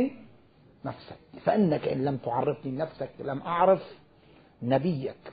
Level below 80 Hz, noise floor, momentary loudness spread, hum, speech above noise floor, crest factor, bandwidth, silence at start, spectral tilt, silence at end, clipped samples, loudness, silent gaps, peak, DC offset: -62 dBFS; -58 dBFS; 16 LU; none; 30 dB; 20 dB; 5 kHz; 0 s; -11.5 dB/octave; 0 s; under 0.1%; -28 LUFS; none; -10 dBFS; under 0.1%